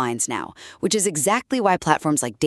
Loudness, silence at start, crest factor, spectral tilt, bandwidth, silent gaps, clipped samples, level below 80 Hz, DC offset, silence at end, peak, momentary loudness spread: -21 LUFS; 0 s; 22 dB; -3.5 dB/octave; 13.5 kHz; none; under 0.1%; -58 dBFS; under 0.1%; 0 s; 0 dBFS; 9 LU